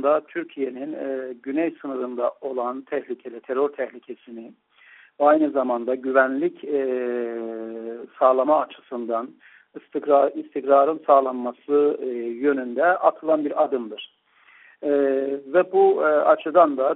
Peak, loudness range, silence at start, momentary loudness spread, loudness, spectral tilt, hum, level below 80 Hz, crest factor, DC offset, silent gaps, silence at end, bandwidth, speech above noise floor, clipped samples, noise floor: -4 dBFS; 7 LU; 0 s; 15 LU; -22 LUFS; -3.5 dB/octave; none; -74 dBFS; 18 dB; under 0.1%; none; 0 s; 4 kHz; 33 dB; under 0.1%; -55 dBFS